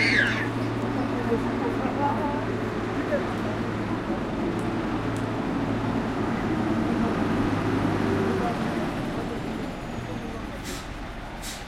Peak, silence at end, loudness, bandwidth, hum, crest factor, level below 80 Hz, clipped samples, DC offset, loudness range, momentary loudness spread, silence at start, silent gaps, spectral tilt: -10 dBFS; 0 s; -27 LUFS; 16 kHz; none; 16 dB; -42 dBFS; under 0.1%; under 0.1%; 3 LU; 9 LU; 0 s; none; -6 dB/octave